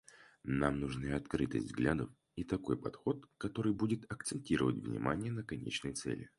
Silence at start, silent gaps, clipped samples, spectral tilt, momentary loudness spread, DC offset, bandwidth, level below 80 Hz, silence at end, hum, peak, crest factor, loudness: 0.15 s; none; under 0.1%; -6 dB/octave; 7 LU; under 0.1%; 11.5 kHz; -56 dBFS; 0.1 s; none; -16 dBFS; 22 dB; -38 LUFS